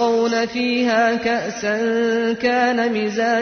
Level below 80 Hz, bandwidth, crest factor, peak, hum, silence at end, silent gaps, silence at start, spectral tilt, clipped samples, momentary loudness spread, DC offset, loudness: -56 dBFS; 6.6 kHz; 12 dB; -6 dBFS; none; 0 s; none; 0 s; -4 dB/octave; under 0.1%; 4 LU; under 0.1%; -19 LUFS